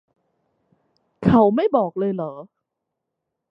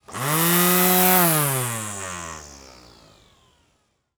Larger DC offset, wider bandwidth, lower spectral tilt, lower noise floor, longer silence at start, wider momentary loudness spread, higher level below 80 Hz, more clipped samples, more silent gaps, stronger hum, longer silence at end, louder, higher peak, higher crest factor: neither; second, 5.6 kHz vs over 20 kHz; first, -10 dB/octave vs -3.5 dB/octave; first, -81 dBFS vs -68 dBFS; first, 1.2 s vs 0.1 s; second, 15 LU vs 18 LU; first, -50 dBFS vs -58 dBFS; neither; neither; neither; second, 1.05 s vs 1.6 s; about the same, -19 LUFS vs -18 LUFS; about the same, -2 dBFS vs 0 dBFS; about the same, 20 dB vs 22 dB